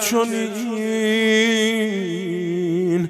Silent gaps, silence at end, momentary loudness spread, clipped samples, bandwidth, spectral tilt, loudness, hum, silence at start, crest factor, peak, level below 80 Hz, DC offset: none; 0 s; 8 LU; under 0.1%; 16 kHz; -4 dB/octave; -20 LUFS; none; 0 s; 14 dB; -6 dBFS; -68 dBFS; under 0.1%